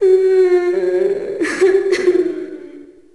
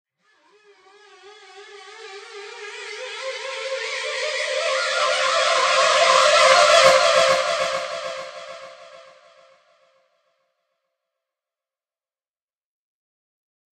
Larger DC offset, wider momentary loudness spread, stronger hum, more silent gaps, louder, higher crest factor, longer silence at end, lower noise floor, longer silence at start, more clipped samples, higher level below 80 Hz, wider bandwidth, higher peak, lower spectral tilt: first, 0.3% vs under 0.1%; second, 13 LU vs 24 LU; neither; neither; first, -15 LUFS vs -18 LUFS; second, 12 dB vs 22 dB; second, 0.3 s vs 4.8 s; second, -38 dBFS vs under -90 dBFS; second, 0 s vs 1.25 s; neither; first, -56 dBFS vs -64 dBFS; second, 11 kHz vs 14 kHz; second, -4 dBFS vs 0 dBFS; first, -4.5 dB/octave vs 0.5 dB/octave